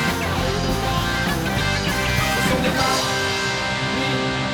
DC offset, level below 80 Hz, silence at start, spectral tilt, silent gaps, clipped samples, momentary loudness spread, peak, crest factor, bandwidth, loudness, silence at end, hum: under 0.1%; -34 dBFS; 0 s; -4 dB/octave; none; under 0.1%; 3 LU; -6 dBFS; 14 dB; over 20 kHz; -20 LUFS; 0 s; none